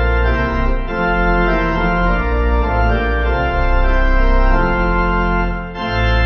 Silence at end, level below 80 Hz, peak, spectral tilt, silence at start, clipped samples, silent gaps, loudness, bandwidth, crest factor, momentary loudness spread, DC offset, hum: 0 s; -16 dBFS; -2 dBFS; -8 dB/octave; 0 s; under 0.1%; none; -17 LUFS; 6 kHz; 12 dB; 4 LU; under 0.1%; none